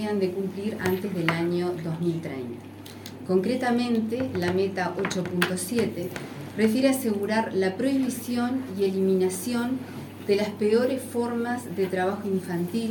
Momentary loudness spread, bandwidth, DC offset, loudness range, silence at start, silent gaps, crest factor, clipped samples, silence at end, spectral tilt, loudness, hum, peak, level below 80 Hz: 10 LU; 17.5 kHz; under 0.1%; 2 LU; 0 s; none; 20 dB; under 0.1%; 0 s; -5.5 dB/octave; -26 LUFS; none; -6 dBFS; -66 dBFS